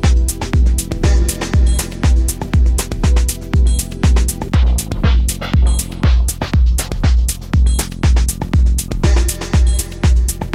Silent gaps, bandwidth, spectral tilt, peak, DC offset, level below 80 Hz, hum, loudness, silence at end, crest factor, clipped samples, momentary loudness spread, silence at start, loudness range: none; 16 kHz; -5 dB/octave; -2 dBFS; under 0.1%; -14 dBFS; none; -16 LUFS; 0 s; 12 dB; under 0.1%; 2 LU; 0 s; 0 LU